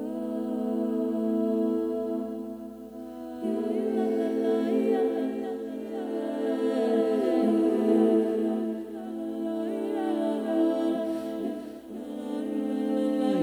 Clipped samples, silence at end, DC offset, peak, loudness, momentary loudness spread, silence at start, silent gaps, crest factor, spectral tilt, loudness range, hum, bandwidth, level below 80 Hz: under 0.1%; 0 s; under 0.1%; -12 dBFS; -28 LUFS; 12 LU; 0 s; none; 16 dB; -7 dB/octave; 4 LU; none; over 20 kHz; -66 dBFS